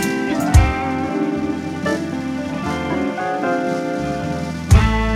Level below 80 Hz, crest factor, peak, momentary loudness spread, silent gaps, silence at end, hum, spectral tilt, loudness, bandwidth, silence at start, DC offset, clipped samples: -24 dBFS; 18 dB; 0 dBFS; 9 LU; none; 0 s; none; -6.5 dB/octave; -20 LUFS; 15 kHz; 0 s; under 0.1%; under 0.1%